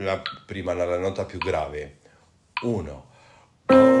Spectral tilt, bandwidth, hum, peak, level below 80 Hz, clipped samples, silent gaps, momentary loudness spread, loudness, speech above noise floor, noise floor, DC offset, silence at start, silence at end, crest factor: -6.5 dB/octave; 10.5 kHz; none; -4 dBFS; -50 dBFS; under 0.1%; none; 19 LU; -24 LUFS; 36 dB; -58 dBFS; under 0.1%; 0 s; 0 s; 20 dB